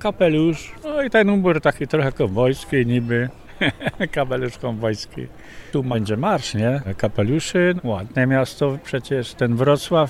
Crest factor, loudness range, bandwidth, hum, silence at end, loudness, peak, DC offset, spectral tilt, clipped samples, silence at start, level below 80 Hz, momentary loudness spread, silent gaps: 16 dB; 4 LU; 14 kHz; none; 0 s; -21 LUFS; -4 dBFS; under 0.1%; -6.5 dB/octave; under 0.1%; 0 s; -44 dBFS; 9 LU; none